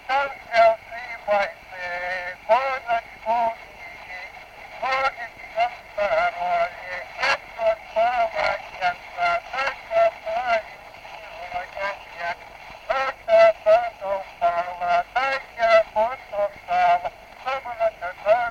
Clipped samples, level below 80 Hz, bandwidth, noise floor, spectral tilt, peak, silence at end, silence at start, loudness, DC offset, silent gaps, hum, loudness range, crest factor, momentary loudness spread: under 0.1%; -56 dBFS; 8.8 kHz; -42 dBFS; -3 dB/octave; -4 dBFS; 0 s; 0 s; -23 LUFS; under 0.1%; none; none; 5 LU; 18 dB; 17 LU